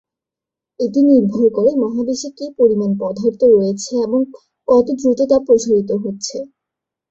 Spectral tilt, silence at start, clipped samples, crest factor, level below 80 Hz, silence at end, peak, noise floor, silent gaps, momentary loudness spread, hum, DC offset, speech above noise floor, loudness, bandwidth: -6.5 dB/octave; 0.8 s; under 0.1%; 14 dB; -56 dBFS; 0.65 s; -2 dBFS; -86 dBFS; none; 12 LU; none; under 0.1%; 71 dB; -16 LUFS; 8 kHz